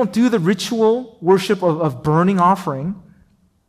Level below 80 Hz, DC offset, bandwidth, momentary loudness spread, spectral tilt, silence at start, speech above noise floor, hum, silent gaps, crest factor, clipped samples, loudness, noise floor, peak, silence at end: -54 dBFS; under 0.1%; 15.5 kHz; 10 LU; -6.5 dB/octave; 0 s; 39 dB; none; none; 14 dB; under 0.1%; -17 LUFS; -56 dBFS; -4 dBFS; 0.7 s